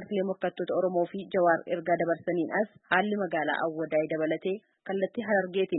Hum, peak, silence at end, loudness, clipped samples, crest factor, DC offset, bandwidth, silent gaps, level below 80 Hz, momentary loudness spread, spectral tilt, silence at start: none; -8 dBFS; 0 s; -29 LUFS; under 0.1%; 20 dB; under 0.1%; 4.1 kHz; none; -78 dBFS; 6 LU; -10 dB/octave; 0 s